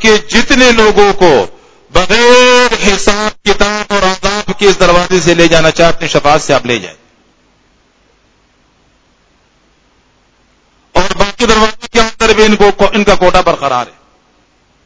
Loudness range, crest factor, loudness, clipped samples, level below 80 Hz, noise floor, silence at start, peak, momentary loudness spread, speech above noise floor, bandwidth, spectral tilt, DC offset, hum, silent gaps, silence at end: 9 LU; 10 dB; -8 LUFS; 2%; -28 dBFS; -51 dBFS; 0 s; 0 dBFS; 9 LU; 44 dB; 8 kHz; -3.5 dB/octave; under 0.1%; none; none; 0.95 s